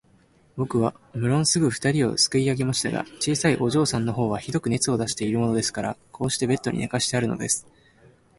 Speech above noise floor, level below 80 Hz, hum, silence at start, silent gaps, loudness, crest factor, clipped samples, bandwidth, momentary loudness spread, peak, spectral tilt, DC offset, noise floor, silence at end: 35 dB; -54 dBFS; none; 0.55 s; none; -24 LUFS; 18 dB; under 0.1%; 11.5 kHz; 7 LU; -6 dBFS; -4.5 dB/octave; under 0.1%; -58 dBFS; 0.75 s